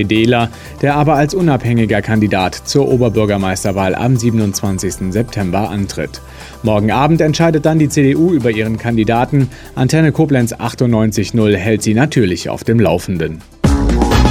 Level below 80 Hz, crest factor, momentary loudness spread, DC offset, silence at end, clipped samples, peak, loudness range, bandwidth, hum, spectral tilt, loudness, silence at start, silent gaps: -26 dBFS; 12 dB; 7 LU; under 0.1%; 0 s; under 0.1%; 0 dBFS; 3 LU; 16.5 kHz; none; -6 dB/octave; -14 LUFS; 0 s; none